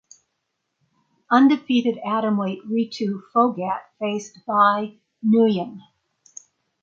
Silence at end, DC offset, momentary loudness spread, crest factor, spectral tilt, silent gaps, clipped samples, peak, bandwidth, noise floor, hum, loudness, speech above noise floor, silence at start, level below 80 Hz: 1.05 s; under 0.1%; 11 LU; 20 dB; -6 dB/octave; none; under 0.1%; -4 dBFS; 7.4 kHz; -77 dBFS; none; -21 LUFS; 56 dB; 1.3 s; -72 dBFS